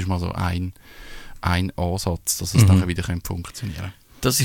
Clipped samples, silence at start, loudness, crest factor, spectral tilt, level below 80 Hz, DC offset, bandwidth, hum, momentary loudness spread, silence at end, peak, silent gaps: under 0.1%; 0 s; -22 LUFS; 20 dB; -5 dB/octave; -38 dBFS; under 0.1%; 17.5 kHz; none; 18 LU; 0 s; -2 dBFS; none